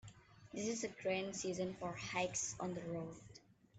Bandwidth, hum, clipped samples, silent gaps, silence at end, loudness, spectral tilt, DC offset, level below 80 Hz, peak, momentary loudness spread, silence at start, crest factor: 9 kHz; none; under 0.1%; none; 0 s; -42 LUFS; -3.5 dB/octave; under 0.1%; -72 dBFS; -26 dBFS; 17 LU; 0.05 s; 18 dB